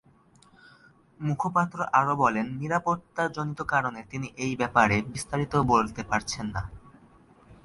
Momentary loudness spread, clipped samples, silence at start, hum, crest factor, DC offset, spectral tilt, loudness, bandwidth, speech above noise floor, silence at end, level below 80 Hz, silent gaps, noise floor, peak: 11 LU; under 0.1%; 1.2 s; none; 22 dB; under 0.1%; -5.5 dB/octave; -27 LUFS; 11.5 kHz; 32 dB; 0.1 s; -52 dBFS; none; -59 dBFS; -6 dBFS